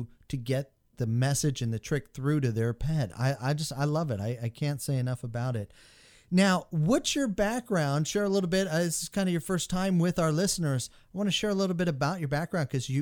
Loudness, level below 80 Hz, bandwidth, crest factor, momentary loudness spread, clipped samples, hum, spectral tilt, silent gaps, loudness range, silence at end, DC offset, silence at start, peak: -29 LUFS; -50 dBFS; 19 kHz; 18 dB; 7 LU; under 0.1%; none; -5.5 dB/octave; none; 3 LU; 0 s; under 0.1%; 0 s; -12 dBFS